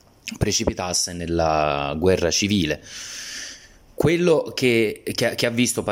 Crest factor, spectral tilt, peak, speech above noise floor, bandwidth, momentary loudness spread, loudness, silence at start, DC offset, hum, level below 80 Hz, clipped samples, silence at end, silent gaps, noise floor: 16 dB; -4 dB/octave; -6 dBFS; 23 dB; 16.5 kHz; 12 LU; -21 LUFS; 0.25 s; under 0.1%; none; -42 dBFS; under 0.1%; 0 s; none; -44 dBFS